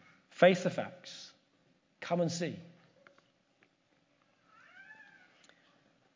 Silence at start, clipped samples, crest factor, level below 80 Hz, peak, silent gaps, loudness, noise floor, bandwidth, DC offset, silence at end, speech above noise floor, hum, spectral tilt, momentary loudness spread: 0.4 s; under 0.1%; 26 dB; -84 dBFS; -12 dBFS; none; -31 LUFS; -73 dBFS; 7.6 kHz; under 0.1%; 1.2 s; 42 dB; none; -5.5 dB/octave; 28 LU